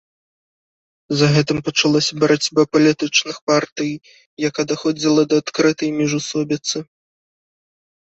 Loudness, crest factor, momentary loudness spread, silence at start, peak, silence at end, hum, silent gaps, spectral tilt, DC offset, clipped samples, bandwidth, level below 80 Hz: -18 LUFS; 18 dB; 9 LU; 1.1 s; -2 dBFS; 1.35 s; none; 3.41-3.47 s, 3.72-3.76 s, 4.26-4.37 s; -4.5 dB/octave; under 0.1%; under 0.1%; 8.2 kHz; -58 dBFS